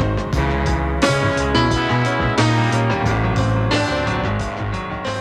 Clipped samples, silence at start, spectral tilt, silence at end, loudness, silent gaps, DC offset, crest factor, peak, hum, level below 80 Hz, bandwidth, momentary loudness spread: under 0.1%; 0 s; -5.5 dB/octave; 0 s; -19 LUFS; none; under 0.1%; 16 dB; -2 dBFS; none; -28 dBFS; 11.5 kHz; 7 LU